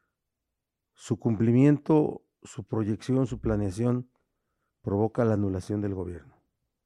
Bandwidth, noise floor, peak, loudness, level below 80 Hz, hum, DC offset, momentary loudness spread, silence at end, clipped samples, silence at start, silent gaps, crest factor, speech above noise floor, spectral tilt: 11 kHz; -85 dBFS; -10 dBFS; -27 LUFS; -52 dBFS; none; under 0.1%; 17 LU; 0.65 s; under 0.1%; 1 s; none; 18 dB; 59 dB; -8.5 dB/octave